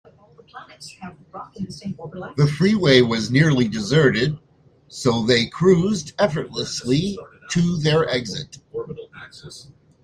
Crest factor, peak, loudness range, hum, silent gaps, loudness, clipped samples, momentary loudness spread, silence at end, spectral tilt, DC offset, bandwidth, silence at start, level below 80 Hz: 20 dB; 0 dBFS; 5 LU; none; none; -19 LUFS; under 0.1%; 22 LU; 0.4 s; -5.5 dB/octave; under 0.1%; 10.5 kHz; 0.55 s; -52 dBFS